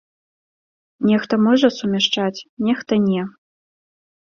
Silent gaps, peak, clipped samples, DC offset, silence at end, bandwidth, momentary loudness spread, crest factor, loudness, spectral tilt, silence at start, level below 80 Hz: 2.49-2.57 s; -2 dBFS; under 0.1%; under 0.1%; 0.95 s; 7 kHz; 9 LU; 18 dB; -19 LUFS; -5.5 dB/octave; 1 s; -62 dBFS